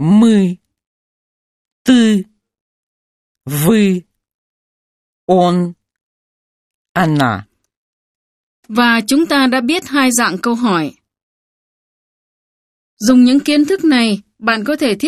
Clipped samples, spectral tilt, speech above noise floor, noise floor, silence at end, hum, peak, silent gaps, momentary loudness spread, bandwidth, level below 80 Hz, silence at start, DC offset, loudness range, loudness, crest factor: under 0.1%; -5 dB/octave; over 78 dB; under -90 dBFS; 0 s; none; 0 dBFS; 0.86-1.65 s, 1.72-1.85 s, 2.61-3.35 s, 4.34-5.28 s, 6.01-6.95 s, 7.77-8.63 s, 11.23-12.97 s; 12 LU; 14.5 kHz; -54 dBFS; 0 s; under 0.1%; 5 LU; -13 LUFS; 16 dB